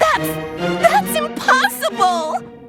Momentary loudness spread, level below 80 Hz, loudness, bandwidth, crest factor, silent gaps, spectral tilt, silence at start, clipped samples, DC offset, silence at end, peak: 8 LU; -50 dBFS; -17 LUFS; 19 kHz; 16 dB; none; -3.5 dB/octave; 0 s; under 0.1%; under 0.1%; 0 s; 0 dBFS